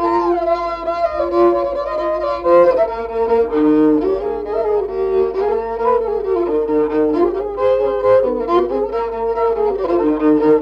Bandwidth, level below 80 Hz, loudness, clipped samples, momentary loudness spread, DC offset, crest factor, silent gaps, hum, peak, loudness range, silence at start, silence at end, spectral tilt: 6.2 kHz; -42 dBFS; -16 LUFS; under 0.1%; 6 LU; under 0.1%; 14 dB; none; 50 Hz at -40 dBFS; -2 dBFS; 2 LU; 0 s; 0 s; -8 dB/octave